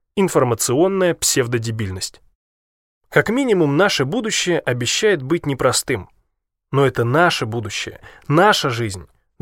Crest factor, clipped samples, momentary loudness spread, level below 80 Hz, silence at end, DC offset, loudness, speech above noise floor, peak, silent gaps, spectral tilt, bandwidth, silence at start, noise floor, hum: 18 dB; under 0.1%; 10 LU; -50 dBFS; 0.35 s; under 0.1%; -18 LUFS; 55 dB; 0 dBFS; 2.35-3.01 s; -4 dB/octave; 16.5 kHz; 0.15 s; -73 dBFS; none